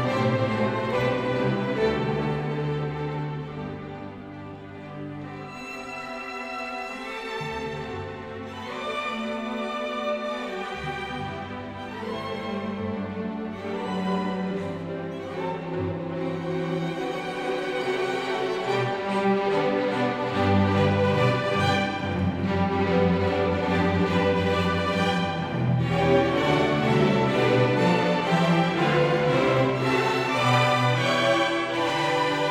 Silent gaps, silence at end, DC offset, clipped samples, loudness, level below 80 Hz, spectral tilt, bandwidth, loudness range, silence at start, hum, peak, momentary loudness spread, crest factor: none; 0 s; under 0.1%; under 0.1%; -25 LUFS; -52 dBFS; -6.5 dB/octave; 14.5 kHz; 11 LU; 0 s; none; -8 dBFS; 13 LU; 16 dB